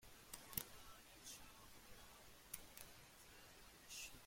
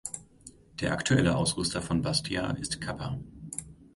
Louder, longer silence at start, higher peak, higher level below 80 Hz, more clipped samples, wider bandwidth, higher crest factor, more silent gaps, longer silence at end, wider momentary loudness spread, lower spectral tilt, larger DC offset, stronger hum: second, -56 LUFS vs -30 LUFS; about the same, 0 s vs 0.05 s; second, -24 dBFS vs -8 dBFS; second, -72 dBFS vs -50 dBFS; neither; first, 16.5 kHz vs 11.5 kHz; first, 34 dB vs 22 dB; neither; about the same, 0 s vs 0.1 s; about the same, 13 LU vs 15 LU; second, -1.5 dB/octave vs -4.5 dB/octave; neither; neither